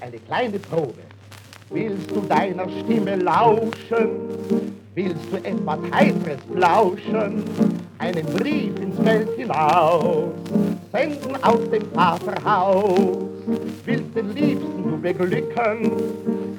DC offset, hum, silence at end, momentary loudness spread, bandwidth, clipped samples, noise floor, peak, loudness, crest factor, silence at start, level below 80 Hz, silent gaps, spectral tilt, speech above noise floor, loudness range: under 0.1%; none; 0 s; 9 LU; 18.5 kHz; under 0.1%; -43 dBFS; 0 dBFS; -21 LUFS; 20 dB; 0 s; -74 dBFS; none; -7 dB/octave; 22 dB; 2 LU